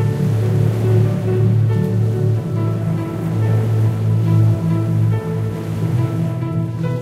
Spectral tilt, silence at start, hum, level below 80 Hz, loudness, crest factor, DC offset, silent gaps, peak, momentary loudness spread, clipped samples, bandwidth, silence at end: -9 dB/octave; 0 s; none; -44 dBFS; -18 LUFS; 12 dB; under 0.1%; none; -4 dBFS; 6 LU; under 0.1%; 8 kHz; 0 s